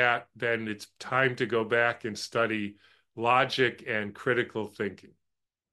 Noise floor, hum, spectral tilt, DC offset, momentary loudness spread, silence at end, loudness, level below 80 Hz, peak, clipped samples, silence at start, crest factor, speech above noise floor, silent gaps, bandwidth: -85 dBFS; none; -5 dB/octave; under 0.1%; 11 LU; 0.65 s; -28 LUFS; -72 dBFS; -8 dBFS; under 0.1%; 0 s; 20 dB; 56 dB; none; 12.5 kHz